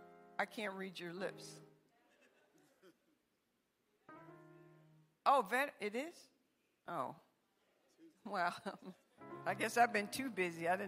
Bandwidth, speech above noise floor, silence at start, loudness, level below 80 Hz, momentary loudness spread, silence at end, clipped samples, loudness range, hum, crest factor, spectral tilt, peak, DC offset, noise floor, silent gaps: 16 kHz; 43 dB; 0 s; -40 LUFS; under -90 dBFS; 24 LU; 0 s; under 0.1%; 12 LU; none; 24 dB; -4 dB/octave; -18 dBFS; under 0.1%; -83 dBFS; none